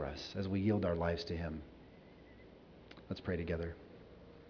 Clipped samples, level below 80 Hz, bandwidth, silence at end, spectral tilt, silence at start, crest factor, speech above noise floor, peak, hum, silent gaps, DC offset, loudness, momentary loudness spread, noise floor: under 0.1%; -56 dBFS; 5.4 kHz; 0 s; -6 dB/octave; 0 s; 20 dB; 21 dB; -20 dBFS; none; none; under 0.1%; -39 LUFS; 24 LU; -58 dBFS